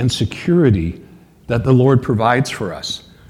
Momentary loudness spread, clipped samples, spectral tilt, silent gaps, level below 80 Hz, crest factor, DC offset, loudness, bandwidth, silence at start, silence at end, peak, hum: 12 LU; under 0.1%; -6.5 dB/octave; none; -38 dBFS; 16 dB; under 0.1%; -16 LUFS; 13.5 kHz; 0 s; 0.3 s; 0 dBFS; none